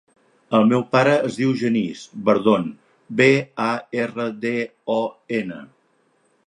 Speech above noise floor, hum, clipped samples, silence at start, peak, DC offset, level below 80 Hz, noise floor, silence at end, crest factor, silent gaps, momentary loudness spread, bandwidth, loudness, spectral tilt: 43 dB; none; under 0.1%; 0.5 s; -2 dBFS; under 0.1%; -66 dBFS; -63 dBFS; 0.8 s; 18 dB; none; 10 LU; 10.5 kHz; -20 LUFS; -6.5 dB/octave